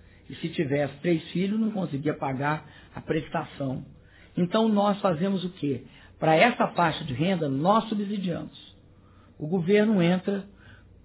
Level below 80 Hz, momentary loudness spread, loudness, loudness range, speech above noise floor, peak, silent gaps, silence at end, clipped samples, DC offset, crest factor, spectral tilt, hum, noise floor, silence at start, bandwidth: -58 dBFS; 13 LU; -26 LUFS; 4 LU; 28 dB; -6 dBFS; none; 0.3 s; under 0.1%; under 0.1%; 20 dB; -10.5 dB/octave; none; -54 dBFS; 0.3 s; 4 kHz